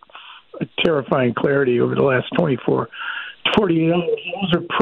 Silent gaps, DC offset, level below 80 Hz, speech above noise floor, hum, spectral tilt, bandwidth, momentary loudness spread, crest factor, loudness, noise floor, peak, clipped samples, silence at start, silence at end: none; under 0.1%; -52 dBFS; 24 dB; none; -8 dB/octave; 7.2 kHz; 11 LU; 16 dB; -19 LUFS; -42 dBFS; -4 dBFS; under 0.1%; 0.15 s; 0 s